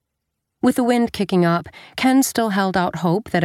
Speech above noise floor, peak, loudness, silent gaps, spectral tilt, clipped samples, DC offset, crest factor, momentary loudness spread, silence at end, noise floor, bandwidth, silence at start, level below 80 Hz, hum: 59 dB; -2 dBFS; -19 LUFS; none; -5.5 dB/octave; under 0.1%; under 0.1%; 16 dB; 5 LU; 0 s; -78 dBFS; 16 kHz; 0.65 s; -52 dBFS; none